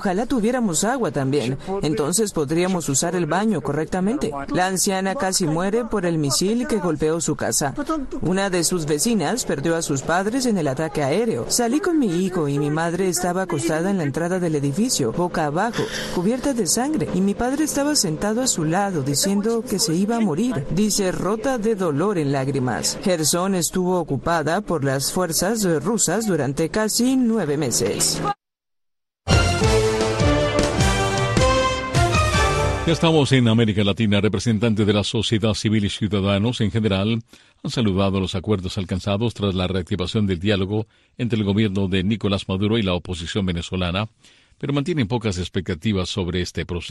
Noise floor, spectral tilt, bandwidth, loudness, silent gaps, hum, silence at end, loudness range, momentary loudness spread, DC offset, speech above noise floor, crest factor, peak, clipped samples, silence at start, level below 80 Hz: -82 dBFS; -4.5 dB/octave; 12.5 kHz; -21 LUFS; none; none; 0 s; 4 LU; 5 LU; under 0.1%; 61 dB; 16 dB; -4 dBFS; under 0.1%; 0 s; -38 dBFS